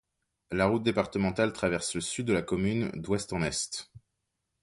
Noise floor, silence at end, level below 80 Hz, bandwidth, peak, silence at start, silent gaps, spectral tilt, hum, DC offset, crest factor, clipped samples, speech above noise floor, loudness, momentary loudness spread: -82 dBFS; 0.65 s; -54 dBFS; 11.5 kHz; -10 dBFS; 0.5 s; none; -4.5 dB/octave; none; under 0.1%; 20 dB; under 0.1%; 53 dB; -30 LUFS; 5 LU